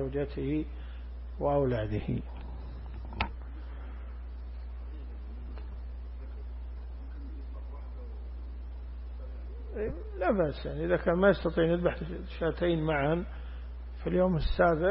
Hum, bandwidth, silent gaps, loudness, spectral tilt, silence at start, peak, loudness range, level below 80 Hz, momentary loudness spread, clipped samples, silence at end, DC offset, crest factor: 60 Hz at -40 dBFS; 5.8 kHz; none; -32 LUFS; -11 dB/octave; 0 s; -12 dBFS; 14 LU; -40 dBFS; 16 LU; under 0.1%; 0 s; under 0.1%; 20 dB